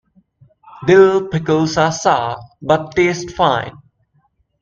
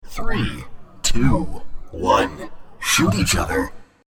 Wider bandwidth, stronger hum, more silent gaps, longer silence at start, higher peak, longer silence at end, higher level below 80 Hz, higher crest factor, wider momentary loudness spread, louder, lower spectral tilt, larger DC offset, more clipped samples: second, 7.6 kHz vs 17 kHz; neither; neither; first, 0.8 s vs 0.05 s; about the same, 0 dBFS vs -2 dBFS; first, 0.9 s vs 0.2 s; second, -48 dBFS vs -30 dBFS; about the same, 16 dB vs 16 dB; second, 12 LU vs 19 LU; first, -15 LUFS vs -20 LUFS; first, -5.5 dB/octave vs -4 dB/octave; neither; neither